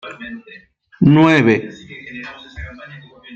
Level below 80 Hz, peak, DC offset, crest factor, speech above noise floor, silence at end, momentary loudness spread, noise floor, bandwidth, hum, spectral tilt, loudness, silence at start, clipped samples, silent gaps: -46 dBFS; -2 dBFS; under 0.1%; 16 dB; 25 dB; 0 s; 24 LU; -38 dBFS; 8 kHz; none; -7.5 dB/octave; -13 LUFS; 0.05 s; under 0.1%; none